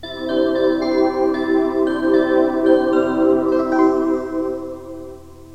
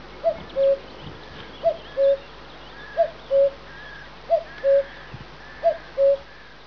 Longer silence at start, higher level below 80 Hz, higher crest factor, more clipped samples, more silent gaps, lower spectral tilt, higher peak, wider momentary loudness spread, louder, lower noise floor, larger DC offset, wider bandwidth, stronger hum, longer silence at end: about the same, 0 s vs 0 s; about the same, -50 dBFS vs -50 dBFS; about the same, 16 dB vs 14 dB; neither; neither; about the same, -6.5 dB/octave vs -6 dB/octave; first, -2 dBFS vs -10 dBFS; second, 13 LU vs 19 LU; first, -17 LUFS vs -23 LUFS; second, -37 dBFS vs -44 dBFS; about the same, 0.5% vs 0.4%; first, 8 kHz vs 5.4 kHz; neither; second, 0 s vs 0.45 s